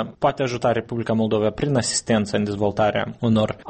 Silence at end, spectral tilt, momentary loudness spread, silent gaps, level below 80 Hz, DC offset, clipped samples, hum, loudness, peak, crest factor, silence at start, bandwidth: 0 s; -5 dB/octave; 3 LU; none; -48 dBFS; under 0.1%; under 0.1%; none; -22 LUFS; -6 dBFS; 14 dB; 0 s; 8.8 kHz